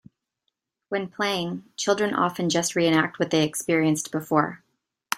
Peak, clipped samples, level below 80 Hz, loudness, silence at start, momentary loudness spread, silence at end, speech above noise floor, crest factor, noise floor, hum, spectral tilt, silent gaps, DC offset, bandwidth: -4 dBFS; under 0.1%; -66 dBFS; -24 LUFS; 0.9 s; 9 LU; 0 s; 55 dB; 22 dB; -79 dBFS; none; -4 dB/octave; none; under 0.1%; 16 kHz